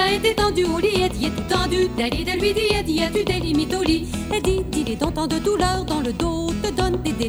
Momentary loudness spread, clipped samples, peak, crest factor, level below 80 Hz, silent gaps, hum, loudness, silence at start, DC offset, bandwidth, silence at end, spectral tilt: 4 LU; under 0.1%; -4 dBFS; 16 dB; -32 dBFS; none; none; -21 LUFS; 0 s; under 0.1%; over 20 kHz; 0 s; -5 dB/octave